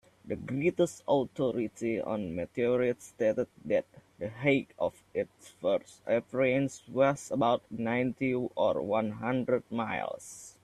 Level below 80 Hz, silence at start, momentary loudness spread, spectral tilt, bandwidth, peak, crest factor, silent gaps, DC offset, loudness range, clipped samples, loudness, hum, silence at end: -66 dBFS; 0.25 s; 8 LU; -6 dB/octave; 13 kHz; -14 dBFS; 18 dB; none; under 0.1%; 2 LU; under 0.1%; -31 LUFS; none; 0.15 s